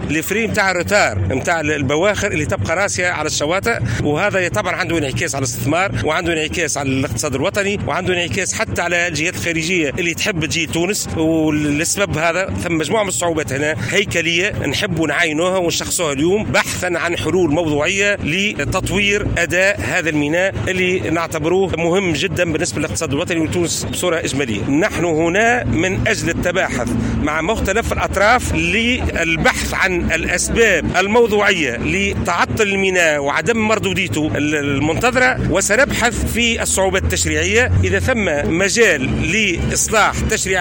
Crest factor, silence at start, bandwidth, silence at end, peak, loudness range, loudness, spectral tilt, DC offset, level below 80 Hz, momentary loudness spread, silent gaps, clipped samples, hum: 14 dB; 0 s; 17 kHz; 0 s; -2 dBFS; 3 LU; -16 LUFS; -4 dB/octave; under 0.1%; -34 dBFS; 5 LU; none; under 0.1%; none